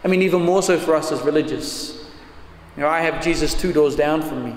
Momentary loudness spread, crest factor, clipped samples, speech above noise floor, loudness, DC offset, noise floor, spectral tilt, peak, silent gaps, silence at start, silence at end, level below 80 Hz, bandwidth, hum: 11 LU; 14 dB; under 0.1%; 22 dB; -19 LUFS; under 0.1%; -41 dBFS; -5 dB/octave; -6 dBFS; none; 0 s; 0 s; -36 dBFS; 16 kHz; none